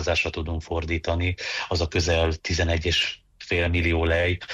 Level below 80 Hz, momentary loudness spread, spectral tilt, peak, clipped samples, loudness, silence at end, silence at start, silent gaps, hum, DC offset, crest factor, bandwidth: -34 dBFS; 6 LU; -4.5 dB/octave; -10 dBFS; under 0.1%; -24 LUFS; 0 s; 0 s; none; none; under 0.1%; 14 dB; 7.8 kHz